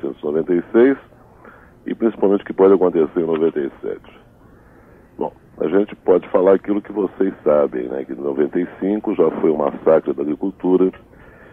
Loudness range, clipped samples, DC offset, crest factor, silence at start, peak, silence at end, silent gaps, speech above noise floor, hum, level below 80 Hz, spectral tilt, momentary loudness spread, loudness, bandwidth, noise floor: 3 LU; under 0.1%; under 0.1%; 16 dB; 0.05 s; -2 dBFS; 0.55 s; none; 30 dB; none; -54 dBFS; -10 dB/octave; 12 LU; -18 LUFS; 3.7 kHz; -47 dBFS